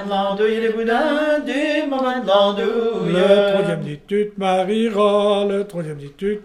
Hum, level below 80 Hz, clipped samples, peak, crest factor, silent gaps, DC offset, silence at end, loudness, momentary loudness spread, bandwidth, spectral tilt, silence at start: none; -54 dBFS; under 0.1%; -2 dBFS; 16 dB; none; under 0.1%; 0 s; -18 LUFS; 9 LU; 12 kHz; -6 dB/octave; 0 s